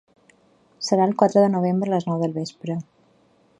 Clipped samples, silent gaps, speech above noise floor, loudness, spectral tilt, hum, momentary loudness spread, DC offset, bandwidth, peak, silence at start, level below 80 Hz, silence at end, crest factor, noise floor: under 0.1%; none; 39 dB; -22 LUFS; -6.5 dB/octave; none; 13 LU; under 0.1%; 11 kHz; -2 dBFS; 0.8 s; -70 dBFS; 0.75 s; 22 dB; -59 dBFS